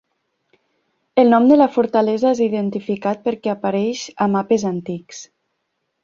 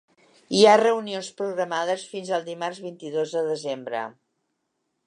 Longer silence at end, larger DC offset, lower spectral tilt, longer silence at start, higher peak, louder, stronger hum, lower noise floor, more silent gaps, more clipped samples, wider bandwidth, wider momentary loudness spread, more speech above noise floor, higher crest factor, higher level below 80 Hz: second, 0.8 s vs 0.95 s; neither; first, -6.5 dB/octave vs -4 dB/octave; first, 1.15 s vs 0.5 s; about the same, -2 dBFS vs -4 dBFS; first, -18 LUFS vs -24 LUFS; neither; second, -73 dBFS vs -77 dBFS; neither; neither; second, 7.6 kHz vs 11 kHz; second, 13 LU vs 16 LU; about the same, 56 dB vs 53 dB; about the same, 18 dB vs 20 dB; first, -62 dBFS vs -78 dBFS